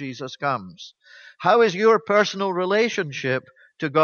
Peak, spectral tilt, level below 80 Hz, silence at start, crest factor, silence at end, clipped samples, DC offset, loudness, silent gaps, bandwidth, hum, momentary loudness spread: -4 dBFS; -5 dB/octave; -72 dBFS; 0 s; 18 dB; 0 s; under 0.1%; under 0.1%; -21 LUFS; none; 7 kHz; none; 15 LU